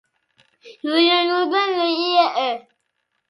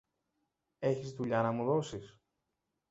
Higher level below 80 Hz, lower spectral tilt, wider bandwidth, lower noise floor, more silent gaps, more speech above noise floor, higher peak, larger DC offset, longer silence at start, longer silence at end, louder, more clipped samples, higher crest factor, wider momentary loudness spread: second, -78 dBFS vs -70 dBFS; second, -2.5 dB/octave vs -6.5 dB/octave; first, 11.5 kHz vs 8 kHz; second, -73 dBFS vs -86 dBFS; neither; about the same, 54 dB vs 52 dB; first, -2 dBFS vs -16 dBFS; neither; second, 0.65 s vs 0.8 s; about the same, 0.7 s vs 0.8 s; first, -18 LUFS vs -34 LUFS; neither; about the same, 18 dB vs 20 dB; about the same, 9 LU vs 9 LU